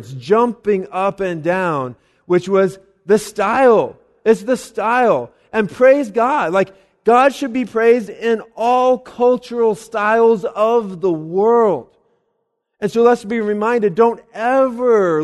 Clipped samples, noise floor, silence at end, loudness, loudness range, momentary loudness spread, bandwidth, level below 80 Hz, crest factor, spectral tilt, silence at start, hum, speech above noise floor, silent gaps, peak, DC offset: under 0.1%; -70 dBFS; 0 s; -16 LUFS; 2 LU; 8 LU; 12.5 kHz; -58 dBFS; 16 dB; -6 dB/octave; 0 s; none; 55 dB; none; 0 dBFS; under 0.1%